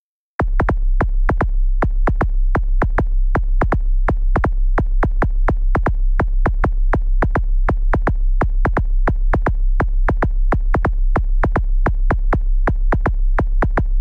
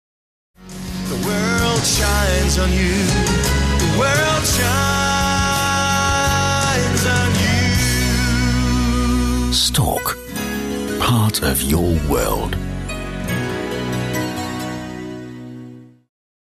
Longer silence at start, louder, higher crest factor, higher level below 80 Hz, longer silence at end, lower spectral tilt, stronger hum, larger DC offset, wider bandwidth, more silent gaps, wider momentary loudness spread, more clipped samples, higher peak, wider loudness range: second, 0.4 s vs 0.6 s; about the same, -20 LUFS vs -18 LUFS; about the same, 10 dB vs 12 dB; first, -16 dBFS vs -26 dBFS; second, 0 s vs 0.7 s; first, -9.5 dB/octave vs -4 dB/octave; neither; neither; second, 2.7 kHz vs 14.5 kHz; neither; second, 1 LU vs 11 LU; neither; about the same, -6 dBFS vs -6 dBFS; second, 0 LU vs 7 LU